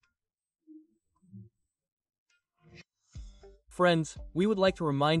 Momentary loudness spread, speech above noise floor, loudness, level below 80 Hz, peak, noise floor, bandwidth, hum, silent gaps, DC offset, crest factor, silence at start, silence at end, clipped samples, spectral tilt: 24 LU; over 63 dB; -28 LUFS; -56 dBFS; -14 dBFS; under -90 dBFS; 11.5 kHz; none; 1.92-1.97 s, 2.18-2.26 s; under 0.1%; 20 dB; 0.7 s; 0 s; under 0.1%; -6 dB/octave